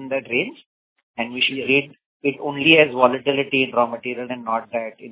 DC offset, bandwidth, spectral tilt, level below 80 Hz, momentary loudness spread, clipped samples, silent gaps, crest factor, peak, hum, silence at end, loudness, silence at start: under 0.1%; 4 kHz; -8.5 dB/octave; -66 dBFS; 15 LU; under 0.1%; 0.66-0.96 s, 1.03-1.14 s, 2.06-2.20 s; 20 dB; 0 dBFS; none; 0 s; -20 LUFS; 0 s